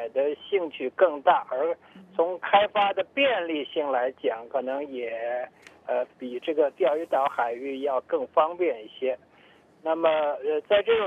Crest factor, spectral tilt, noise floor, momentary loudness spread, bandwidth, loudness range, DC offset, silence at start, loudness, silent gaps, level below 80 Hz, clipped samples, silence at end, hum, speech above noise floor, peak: 18 dB; -5.5 dB/octave; -56 dBFS; 10 LU; 4.8 kHz; 4 LU; under 0.1%; 0 s; -26 LUFS; none; -72 dBFS; under 0.1%; 0 s; none; 31 dB; -8 dBFS